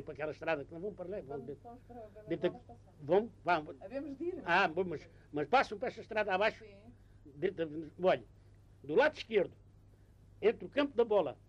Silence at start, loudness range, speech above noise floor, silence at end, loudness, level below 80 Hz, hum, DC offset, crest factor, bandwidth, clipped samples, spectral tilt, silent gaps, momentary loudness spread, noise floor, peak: 0 s; 4 LU; 26 dB; 0.15 s; -35 LUFS; -64 dBFS; none; under 0.1%; 18 dB; 9.4 kHz; under 0.1%; -6 dB/octave; none; 17 LU; -61 dBFS; -18 dBFS